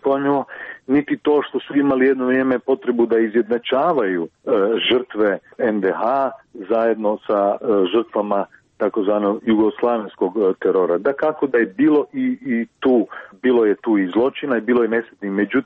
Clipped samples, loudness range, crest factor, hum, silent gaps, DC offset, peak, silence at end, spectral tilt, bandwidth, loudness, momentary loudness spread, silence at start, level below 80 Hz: under 0.1%; 2 LU; 12 dB; none; none; under 0.1%; -6 dBFS; 0.05 s; -8.5 dB/octave; 4.4 kHz; -19 LUFS; 6 LU; 0.05 s; -62 dBFS